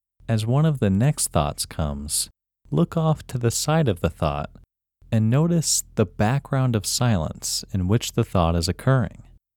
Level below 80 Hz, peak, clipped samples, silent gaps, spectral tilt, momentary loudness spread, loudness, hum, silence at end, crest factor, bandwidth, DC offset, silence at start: -40 dBFS; -4 dBFS; under 0.1%; none; -5 dB/octave; 7 LU; -23 LUFS; none; 0.5 s; 18 dB; 18 kHz; under 0.1%; 0.3 s